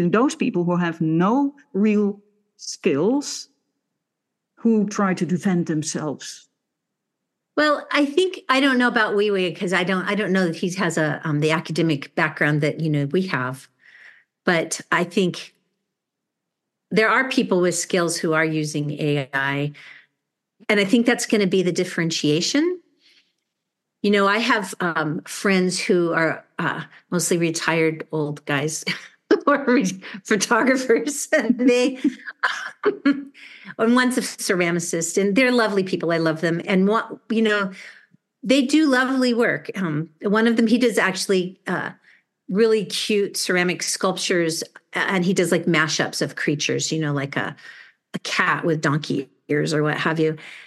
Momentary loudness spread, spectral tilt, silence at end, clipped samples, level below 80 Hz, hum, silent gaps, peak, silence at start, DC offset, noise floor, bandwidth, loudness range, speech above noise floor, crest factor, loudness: 9 LU; -4.5 dB/octave; 0 s; under 0.1%; -74 dBFS; none; none; -4 dBFS; 0 s; under 0.1%; -82 dBFS; 12.5 kHz; 4 LU; 61 dB; 18 dB; -21 LUFS